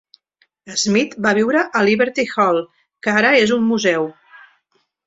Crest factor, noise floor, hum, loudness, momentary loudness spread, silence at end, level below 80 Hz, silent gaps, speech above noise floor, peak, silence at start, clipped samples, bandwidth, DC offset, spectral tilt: 16 dB; -66 dBFS; none; -17 LUFS; 10 LU; 0.95 s; -60 dBFS; none; 49 dB; -2 dBFS; 0.65 s; under 0.1%; 8 kHz; under 0.1%; -4 dB/octave